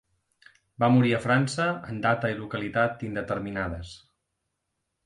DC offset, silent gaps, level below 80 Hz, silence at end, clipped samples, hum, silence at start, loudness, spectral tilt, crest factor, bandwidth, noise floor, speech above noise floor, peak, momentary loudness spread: under 0.1%; none; -52 dBFS; 1.1 s; under 0.1%; none; 0.8 s; -26 LUFS; -6.5 dB/octave; 20 dB; 11 kHz; -80 dBFS; 55 dB; -8 dBFS; 11 LU